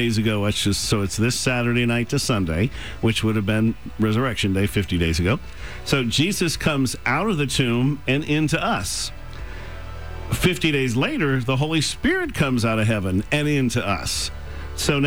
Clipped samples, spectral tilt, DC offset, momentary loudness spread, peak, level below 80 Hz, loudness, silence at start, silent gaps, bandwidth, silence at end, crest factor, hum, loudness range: under 0.1%; -5 dB/octave; 1%; 9 LU; -8 dBFS; -38 dBFS; -22 LUFS; 0 s; none; over 20 kHz; 0 s; 14 dB; none; 2 LU